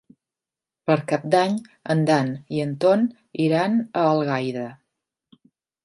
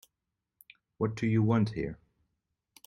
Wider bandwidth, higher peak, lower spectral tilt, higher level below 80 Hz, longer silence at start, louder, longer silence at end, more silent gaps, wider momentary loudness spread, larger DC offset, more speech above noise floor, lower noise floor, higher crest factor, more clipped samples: second, 11.5 kHz vs 13.5 kHz; first, -4 dBFS vs -14 dBFS; second, -7 dB/octave vs -8.5 dB/octave; second, -70 dBFS vs -58 dBFS; second, 0.85 s vs 1 s; first, -22 LUFS vs -30 LUFS; first, 1.1 s vs 0.95 s; neither; second, 9 LU vs 13 LU; neither; first, 68 dB vs 58 dB; about the same, -89 dBFS vs -86 dBFS; about the same, 18 dB vs 18 dB; neither